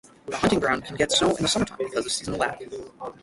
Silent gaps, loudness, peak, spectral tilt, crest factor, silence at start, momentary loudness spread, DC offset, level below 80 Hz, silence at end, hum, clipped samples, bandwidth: none; -24 LUFS; -8 dBFS; -3.5 dB/octave; 18 dB; 0.25 s; 16 LU; under 0.1%; -50 dBFS; 0.1 s; none; under 0.1%; 11.5 kHz